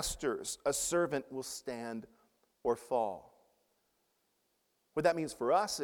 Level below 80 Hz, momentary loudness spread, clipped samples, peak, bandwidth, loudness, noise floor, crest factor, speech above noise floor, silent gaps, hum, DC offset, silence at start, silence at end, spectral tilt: -60 dBFS; 10 LU; under 0.1%; -16 dBFS; 18.5 kHz; -35 LUFS; -78 dBFS; 20 dB; 44 dB; none; none; under 0.1%; 0 s; 0 s; -3 dB/octave